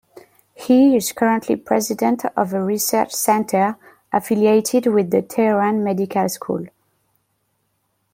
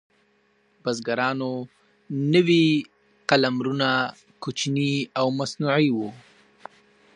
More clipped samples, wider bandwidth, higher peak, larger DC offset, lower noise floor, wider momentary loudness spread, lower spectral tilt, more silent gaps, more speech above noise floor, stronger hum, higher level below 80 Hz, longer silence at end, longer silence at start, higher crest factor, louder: neither; first, 16.5 kHz vs 10.5 kHz; about the same, -2 dBFS vs -2 dBFS; neither; first, -69 dBFS vs -64 dBFS; second, 8 LU vs 15 LU; about the same, -5 dB/octave vs -5.5 dB/octave; neither; first, 51 dB vs 42 dB; neither; first, -64 dBFS vs -72 dBFS; first, 1.45 s vs 0.95 s; second, 0.6 s vs 0.85 s; second, 16 dB vs 22 dB; first, -18 LUFS vs -23 LUFS